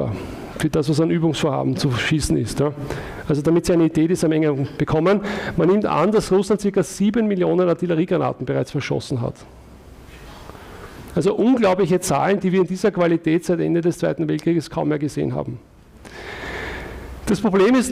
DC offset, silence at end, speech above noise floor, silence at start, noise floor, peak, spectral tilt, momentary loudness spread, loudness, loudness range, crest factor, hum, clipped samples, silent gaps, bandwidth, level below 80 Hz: under 0.1%; 0 s; 23 dB; 0 s; -42 dBFS; -8 dBFS; -6.5 dB/octave; 15 LU; -20 LUFS; 6 LU; 12 dB; none; under 0.1%; none; 15.5 kHz; -44 dBFS